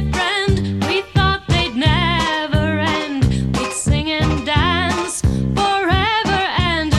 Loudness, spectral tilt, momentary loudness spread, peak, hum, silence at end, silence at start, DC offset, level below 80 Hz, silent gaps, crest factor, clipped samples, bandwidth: -17 LUFS; -5 dB/octave; 3 LU; -2 dBFS; none; 0 s; 0 s; under 0.1%; -28 dBFS; none; 14 dB; under 0.1%; 13 kHz